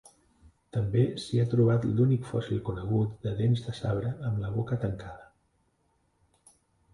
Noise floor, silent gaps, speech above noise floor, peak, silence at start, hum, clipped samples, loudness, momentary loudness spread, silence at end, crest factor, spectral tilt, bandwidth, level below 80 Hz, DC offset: -72 dBFS; none; 44 dB; -12 dBFS; 0.75 s; none; under 0.1%; -29 LUFS; 9 LU; 1.7 s; 16 dB; -8.5 dB/octave; 11 kHz; -52 dBFS; under 0.1%